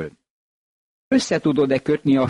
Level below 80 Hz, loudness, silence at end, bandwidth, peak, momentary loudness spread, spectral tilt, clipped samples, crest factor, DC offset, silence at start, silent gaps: -56 dBFS; -20 LUFS; 0 s; 11 kHz; -8 dBFS; 3 LU; -6 dB/octave; under 0.1%; 14 dB; under 0.1%; 0 s; 0.30-1.11 s